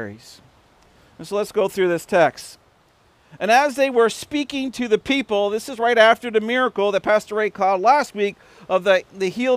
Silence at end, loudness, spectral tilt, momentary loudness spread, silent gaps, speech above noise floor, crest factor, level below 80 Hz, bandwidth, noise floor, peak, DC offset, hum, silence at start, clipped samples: 0 s; -19 LUFS; -4 dB/octave; 10 LU; none; 38 dB; 20 dB; -60 dBFS; 16 kHz; -57 dBFS; 0 dBFS; under 0.1%; none; 0 s; under 0.1%